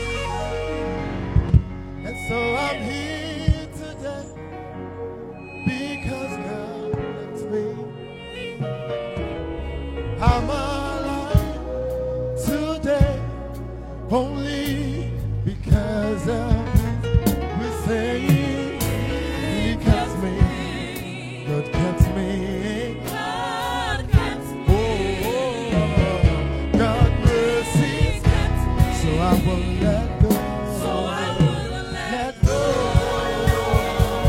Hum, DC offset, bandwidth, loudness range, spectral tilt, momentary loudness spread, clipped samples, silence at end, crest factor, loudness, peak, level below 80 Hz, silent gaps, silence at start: none; under 0.1%; 16.5 kHz; 9 LU; -6.5 dB/octave; 11 LU; under 0.1%; 0 s; 18 dB; -23 LUFS; -2 dBFS; -28 dBFS; none; 0 s